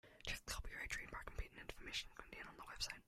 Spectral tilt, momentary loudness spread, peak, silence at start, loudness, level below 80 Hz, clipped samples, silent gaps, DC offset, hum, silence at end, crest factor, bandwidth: -2 dB/octave; 8 LU; -30 dBFS; 0.05 s; -49 LUFS; -56 dBFS; under 0.1%; none; under 0.1%; none; 0.05 s; 20 dB; 16 kHz